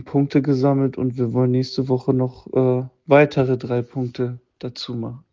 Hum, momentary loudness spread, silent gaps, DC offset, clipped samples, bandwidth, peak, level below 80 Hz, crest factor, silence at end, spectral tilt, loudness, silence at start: none; 12 LU; none; under 0.1%; under 0.1%; 7.4 kHz; 0 dBFS; -56 dBFS; 18 dB; 0.15 s; -8.5 dB/octave; -20 LUFS; 0 s